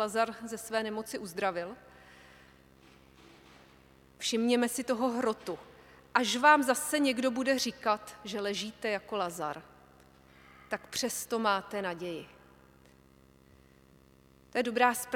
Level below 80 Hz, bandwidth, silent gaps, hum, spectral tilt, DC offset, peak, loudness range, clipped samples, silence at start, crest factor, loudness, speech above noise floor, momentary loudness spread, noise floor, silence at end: -68 dBFS; 18 kHz; none; 50 Hz at -70 dBFS; -2.5 dB/octave; under 0.1%; -10 dBFS; 10 LU; under 0.1%; 0 s; 24 dB; -31 LUFS; 30 dB; 13 LU; -61 dBFS; 0 s